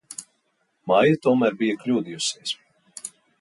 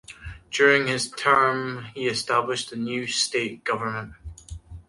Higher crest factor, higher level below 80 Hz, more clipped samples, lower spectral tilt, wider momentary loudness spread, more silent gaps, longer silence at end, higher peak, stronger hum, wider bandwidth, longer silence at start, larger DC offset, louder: about the same, 18 dB vs 22 dB; second, -70 dBFS vs -50 dBFS; neither; first, -4.5 dB/octave vs -3 dB/octave; second, 19 LU vs 22 LU; neither; first, 0.3 s vs 0.05 s; about the same, -6 dBFS vs -4 dBFS; neither; about the same, 11.5 kHz vs 11.5 kHz; about the same, 0.1 s vs 0.1 s; neither; about the same, -22 LUFS vs -23 LUFS